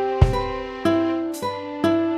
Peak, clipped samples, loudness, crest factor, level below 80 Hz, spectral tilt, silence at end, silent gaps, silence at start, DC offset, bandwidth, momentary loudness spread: -2 dBFS; under 0.1%; -23 LUFS; 20 dB; -30 dBFS; -7 dB/octave; 0 s; none; 0 s; under 0.1%; 14 kHz; 8 LU